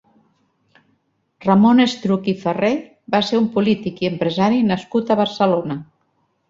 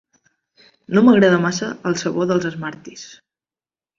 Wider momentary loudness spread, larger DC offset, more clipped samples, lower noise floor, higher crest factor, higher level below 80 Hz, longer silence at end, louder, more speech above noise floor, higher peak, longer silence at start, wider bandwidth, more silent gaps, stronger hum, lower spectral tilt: second, 9 LU vs 24 LU; neither; neither; second, -66 dBFS vs under -90 dBFS; about the same, 18 dB vs 18 dB; about the same, -58 dBFS vs -60 dBFS; second, 0.65 s vs 0.9 s; about the same, -18 LUFS vs -17 LUFS; second, 49 dB vs over 73 dB; about the same, -2 dBFS vs -2 dBFS; first, 1.4 s vs 0.9 s; about the same, 7.6 kHz vs 7.6 kHz; neither; neither; about the same, -6.5 dB/octave vs -5.5 dB/octave